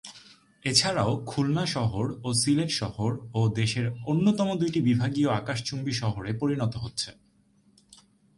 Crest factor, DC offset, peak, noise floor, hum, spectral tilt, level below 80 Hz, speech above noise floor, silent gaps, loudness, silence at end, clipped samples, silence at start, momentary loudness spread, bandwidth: 22 dB; under 0.1%; -6 dBFS; -63 dBFS; none; -5 dB/octave; -54 dBFS; 37 dB; none; -27 LUFS; 1.25 s; under 0.1%; 0.05 s; 7 LU; 11.5 kHz